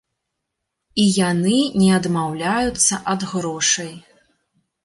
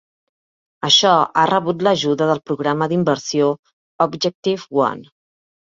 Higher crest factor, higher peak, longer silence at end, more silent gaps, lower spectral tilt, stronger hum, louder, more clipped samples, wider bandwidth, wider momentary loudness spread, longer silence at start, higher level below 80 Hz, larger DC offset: about the same, 16 dB vs 18 dB; second, -4 dBFS vs 0 dBFS; about the same, 0.85 s vs 0.75 s; second, none vs 3.59-3.63 s, 3.73-3.99 s, 4.35-4.43 s; about the same, -4 dB/octave vs -4 dB/octave; neither; about the same, -18 LUFS vs -17 LUFS; neither; first, 11.5 kHz vs 7.8 kHz; about the same, 7 LU vs 9 LU; about the same, 0.95 s vs 0.85 s; first, -50 dBFS vs -64 dBFS; neither